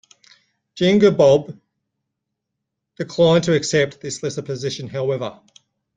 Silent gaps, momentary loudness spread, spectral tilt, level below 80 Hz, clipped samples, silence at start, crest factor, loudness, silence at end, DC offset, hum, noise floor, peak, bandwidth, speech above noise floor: none; 14 LU; -5.5 dB/octave; -58 dBFS; under 0.1%; 0.75 s; 18 dB; -18 LUFS; 0.65 s; under 0.1%; none; -80 dBFS; -2 dBFS; 9.6 kHz; 62 dB